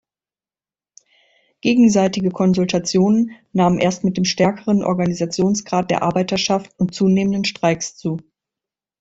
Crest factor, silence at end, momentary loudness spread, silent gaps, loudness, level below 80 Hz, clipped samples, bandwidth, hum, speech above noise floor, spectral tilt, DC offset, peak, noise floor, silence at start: 16 dB; 0.8 s; 7 LU; none; -18 LUFS; -54 dBFS; under 0.1%; 8 kHz; none; over 73 dB; -5.5 dB/octave; under 0.1%; -2 dBFS; under -90 dBFS; 1.65 s